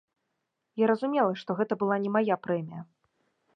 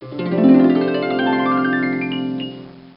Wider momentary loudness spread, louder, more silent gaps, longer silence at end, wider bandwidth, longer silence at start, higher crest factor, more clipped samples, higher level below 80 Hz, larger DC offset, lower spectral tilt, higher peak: about the same, 13 LU vs 14 LU; second, -28 LUFS vs -17 LUFS; neither; first, 0.7 s vs 0.1 s; first, 6.2 kHz vs 5.4 kHz; first, 0.75 s vs 0 s; about the same, 18 dB vs 16 dB; neither; second, -80 dBFS vs -58 dBFS; neither; second, -8.5 dB/octave vs -11.5 dB/octave; second, -12 dBFS vs -2 dBFS